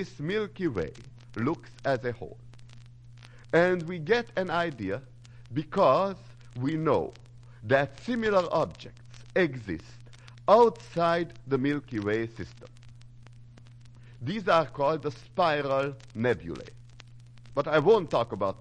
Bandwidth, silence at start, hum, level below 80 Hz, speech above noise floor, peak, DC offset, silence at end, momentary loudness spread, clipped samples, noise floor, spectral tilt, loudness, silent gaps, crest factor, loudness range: 10 kHz; 0 s; none; -58 dBFS; 23 dB; -8 dBFS; under 0.1%; 0.05 s; 16 LU; under 0.1%; -50 dBFS; -7 dB/octave; -28 LUFS; none; 22 dB; 5 LU